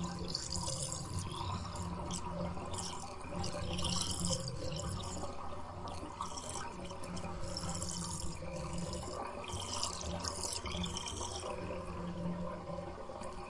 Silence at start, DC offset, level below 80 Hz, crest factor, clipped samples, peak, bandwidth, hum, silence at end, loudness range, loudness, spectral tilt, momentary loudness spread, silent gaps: 0 s; under 0.1%; -52 dBFS; 22 dB; under 0.1%; -18 dBFS; 11.5 kHz; none; 0 s; 3 LU; -40 LUFS; -3.5 dB/octave; 8 LU; none